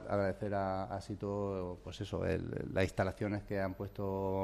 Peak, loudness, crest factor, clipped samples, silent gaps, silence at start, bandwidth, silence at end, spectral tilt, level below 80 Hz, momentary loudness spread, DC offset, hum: -18 dBFS; -38 LUFS; 18 dB; under 0.1%; none; 0 s; 13 kHz; 0 s; -7 dB/octave; -56 dBFS; 6 LU; under 0.1%; none